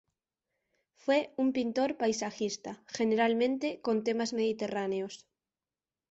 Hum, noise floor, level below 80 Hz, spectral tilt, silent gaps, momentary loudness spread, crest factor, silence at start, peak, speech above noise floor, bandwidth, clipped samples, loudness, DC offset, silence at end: none; under -90 dBFS; -74 dBFS; -4 dB/octave; none; 10 LU; 16 dB; 1.05 s; -16 dBFS; over 59 dB; 8.2 kHz; under 0.1%; -31 LUFS; under 0.1%; 0.95 s